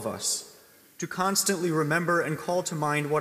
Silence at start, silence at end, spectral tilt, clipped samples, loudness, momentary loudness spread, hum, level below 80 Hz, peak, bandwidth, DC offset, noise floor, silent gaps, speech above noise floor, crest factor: 0 s; 0 s; -3.5 dB/octave; under 0.1%; -27 LUFS; 6 LU; none; -72 dBFS; -10 dBFS; 15.5 kHz; under 0.1%; -55 dBFS; none; 28 dB; 18 dB